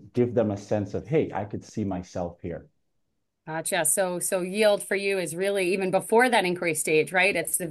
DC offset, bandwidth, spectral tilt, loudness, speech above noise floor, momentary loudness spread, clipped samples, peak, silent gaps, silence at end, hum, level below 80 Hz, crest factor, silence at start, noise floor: under 0.1%; 12.5 kHz; -3.5 dB/octave; -25 LUFS; 53 dB; 12 LU; under 0.1%; -8 dBFS; none; 0 s; none; -66 dBFS; 18 dB; 0 s; -78 dBFS